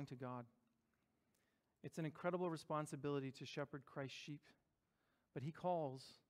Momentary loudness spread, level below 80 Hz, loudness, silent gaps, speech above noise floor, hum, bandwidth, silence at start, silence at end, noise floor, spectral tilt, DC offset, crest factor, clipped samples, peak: 12 LU; -88 dBFS; -48 LUFS; none; 38 dB; none; 15.5 kHz; 0 s; 0.15 s; -86 dBFS; -6.5 dB/octave; under 0.1%; 20 dB; under 0.1%; -30 dBFS